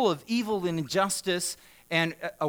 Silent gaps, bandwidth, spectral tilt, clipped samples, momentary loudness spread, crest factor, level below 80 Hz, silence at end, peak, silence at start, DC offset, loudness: none; over 20 kHz; -4 dB/octave; under 0.1%; 4 LU; 18 dB; -66 dBFS; 0 s; -10 dBFS; 0 s; under 0.1%; -28 LUFS